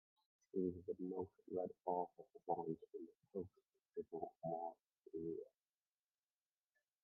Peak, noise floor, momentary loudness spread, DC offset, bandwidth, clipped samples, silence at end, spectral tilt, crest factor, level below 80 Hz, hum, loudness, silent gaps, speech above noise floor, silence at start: -28 dBFS; under -90 dBFS; 12 LU; under 0.1%; 2.4 kHz; under 0.1%; 1.55 s; -9.5 dB/octave; 22 dB; -86 dBFS; none; -48 LUFS; none; over 43 dB; 0.55 s